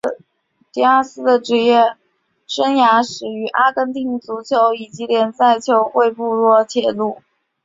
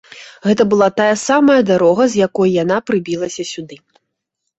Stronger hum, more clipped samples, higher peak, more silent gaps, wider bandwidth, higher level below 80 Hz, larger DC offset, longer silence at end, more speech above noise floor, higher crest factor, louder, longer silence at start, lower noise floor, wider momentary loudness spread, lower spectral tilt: neither; neither; about the same, -2 dBFS vs -2 dBFS; neither; about the same, 7.8 kHz vs 8.2 kHz; second, -66 dBFS vs -56 dBFS; neither; second, 0.5 s vs 0.85 s; second, 49 dB vs 61 dB; about the same, 14 dB vs 14 dB; about the same, -16 LUFS vs -14 LUFS; about the same, 0.05 s vs 0.1 s; second, -64 dBFS vs -75 dBFS; about the same, 11 LU vs 12 LU; about the same, -4 dB/octave vs -5 dB/octave